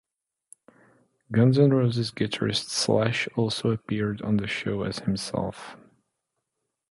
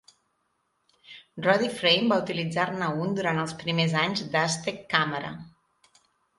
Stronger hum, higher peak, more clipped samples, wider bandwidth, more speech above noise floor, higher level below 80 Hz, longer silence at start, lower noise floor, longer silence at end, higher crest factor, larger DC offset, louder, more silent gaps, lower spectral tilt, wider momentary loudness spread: neither; second, -8 dBFS vs -4 dBFS; neither; about the same, 11.5 kHz vs 11.5 kHz; first, 57 dB vs 48 dB; first, -56 dBFS vs -66 dBFS; first, 1.3 s vs 1.1 s; first, -82 dBFS vs -74 dBFS; first, 1.15 s vs 0.9 s; second, 18 dB vs 24 dB; neither; about the same, -25 LUFS vs -26 LUFS; neither; about the same, -5.5 dB/octave vs -4.5 dB/octave; about the same, 9 LU vs 8 LU